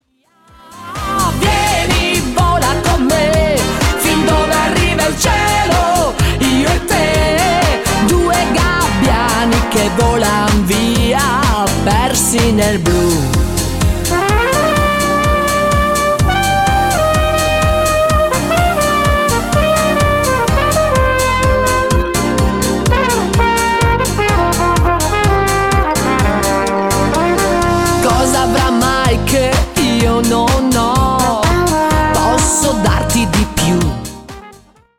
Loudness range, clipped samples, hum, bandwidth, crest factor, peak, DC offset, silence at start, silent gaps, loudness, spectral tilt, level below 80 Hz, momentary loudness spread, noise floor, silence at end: 1 LU; under 0.1%; none; 16.5 kHz; 10 dB; -2 dBFS; under 0.1%; 0.7 s; none; -13 LUFS; -4.5 dB/octave; -22 dBFS; 2 LU; -52 dBFS; 0.45 s